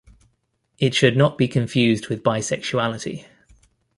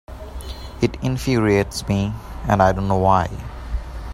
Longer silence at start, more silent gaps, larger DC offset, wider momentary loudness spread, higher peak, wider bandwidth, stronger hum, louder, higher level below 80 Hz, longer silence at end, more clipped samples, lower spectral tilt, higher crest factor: first, 0.8 s vs 0.1 s; neither; neither; second, 10 LU vs 17 LU; about the same, -2 dBFS vs -2 dBFS; second, 11.5 kHz vs 15.5 kHz; neither; about the same, -20 LUFS vs -20 LUFS; second, -56 dBFS vs -32 dBFS; first, 0.75 s vs 0 s; neither; about the same, -5.5 dB/octave vs -6.5 dB/octave; about the same, 20 dB vs 20 dB